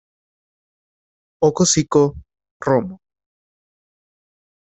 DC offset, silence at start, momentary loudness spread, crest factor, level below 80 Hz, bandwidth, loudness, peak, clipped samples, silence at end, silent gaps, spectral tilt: under 0.1%; 1.4 s; 10 LU; 20 dB; -52 dBFS; 8.2 kHz; -18 LUFS; -2 dBFS; under 0.1%; 1.75 s; 2.51-2.60 s; -4.5 dB/octave